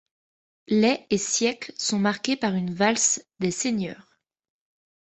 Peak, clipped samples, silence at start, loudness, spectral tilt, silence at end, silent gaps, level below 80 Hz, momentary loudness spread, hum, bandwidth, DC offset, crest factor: -6 dBFS; under 0.1%; 0.7 s; -24 LUFS; -3.5 dB/octave; 1.1 s; none; -64 dBFS; 7 LU; none; 8.4 kHz; under 0.1%; 20 dB